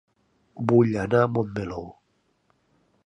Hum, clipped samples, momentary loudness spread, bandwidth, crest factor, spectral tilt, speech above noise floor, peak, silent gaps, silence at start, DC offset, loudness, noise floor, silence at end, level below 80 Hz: none; under 0.1%; 16 LU; 10 kHz; 22 dB; -9 dB/octave; 47 dB; -4 dBFS; none; 0.55 s; under 0.1%; -23 LUFS; -69 dBFS; 1.15 s; -54 dBFS